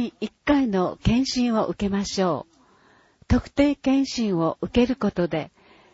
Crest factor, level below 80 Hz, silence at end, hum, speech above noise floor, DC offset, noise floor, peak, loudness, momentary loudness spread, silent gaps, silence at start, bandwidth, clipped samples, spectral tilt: 16 dB; -40 dBFS; 0.45 s; none; 35 dB; under 0.1%; -58 dBFS; -6 dBFS; -23 LUFS; 6 LU; none; 0 s; 8 kHz; under 0.1%; -6 dB/octave